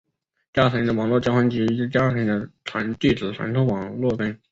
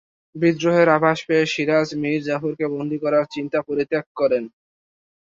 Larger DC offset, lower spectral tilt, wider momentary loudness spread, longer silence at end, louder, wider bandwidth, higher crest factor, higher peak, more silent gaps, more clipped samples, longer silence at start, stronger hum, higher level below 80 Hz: neither; first, -7.5 dB/octave vs -6 dB/octave; about the same, 7 LU vs 9 LU; second, 0.15 s vs 0.75 s; about the same, -22 LUFS vs -20 LUFS; about the same, 7.8 kHz vs 7.6 kHz; about the same, 18 dB vs 18 dB; about the same, -4 dBFS vs -4 dBFS; second, none vs 4.06-4.15 s; neither; first, 0.55 s vs 0.35 s; neither; first, -50 dBFS vs -64 dBFS